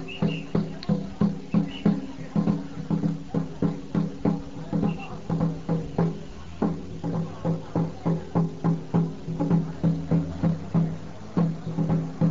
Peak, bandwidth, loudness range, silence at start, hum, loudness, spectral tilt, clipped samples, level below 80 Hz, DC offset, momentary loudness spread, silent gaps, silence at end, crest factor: -8 dBFS; 7.4 kHz; 3 LU; 0 s; none; -27 LUFS; -8.5 dB/octave; under 0.1%; -48 dBFS; 1%; 6 LU; none; 0 s; 18 dB